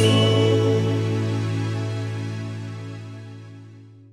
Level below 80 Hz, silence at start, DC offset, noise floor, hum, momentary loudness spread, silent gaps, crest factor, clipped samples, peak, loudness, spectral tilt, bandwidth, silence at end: -66 dBFS; 0 s; under 0.1%; -44 dBFS; none; 22 LU; none; 18 dB; under 0.1%; -6 dBFS; -22 LUFS; -6.5 dB/octave; 11.5 kHz; 0.2 s